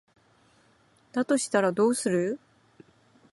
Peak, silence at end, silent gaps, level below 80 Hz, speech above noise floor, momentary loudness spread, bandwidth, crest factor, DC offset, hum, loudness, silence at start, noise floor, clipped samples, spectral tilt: -10 dBFS; 0.95 s; none; -74 dBFS; 38 dB; 10 LU; 12 kHz; 18 dB; under 0.1%; none; -26 LUFS; 1.15 s; -63 dBFS; under 0.1%; -4.5 dB/octave